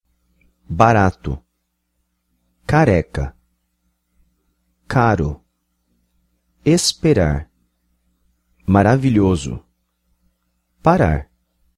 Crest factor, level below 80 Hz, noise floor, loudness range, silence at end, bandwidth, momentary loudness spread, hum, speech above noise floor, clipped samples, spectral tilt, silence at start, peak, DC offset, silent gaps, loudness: 20 dB; -36 dBFS; -71 dBFS; 5 LU; 0.55 s; 13.5 kHz; 16 LU; none; 56 dB; under 0.1%; -6 dB/octave; 0.7 s; 0 dBFS; under 0.1%; none; -17 LUFS